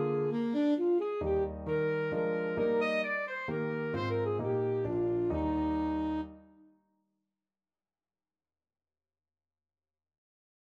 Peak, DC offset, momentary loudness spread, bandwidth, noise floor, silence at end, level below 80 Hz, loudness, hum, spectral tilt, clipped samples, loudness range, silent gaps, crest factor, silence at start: -20 dBFS; under 0.1%; 5 LU; 8 kHz; under -90 dBFS; 4.3 s; -54 dBFS; -32 LUFS; none; -8.5 dB/octave; under 0.1%; 7 LU; none; 14 dB; 0 s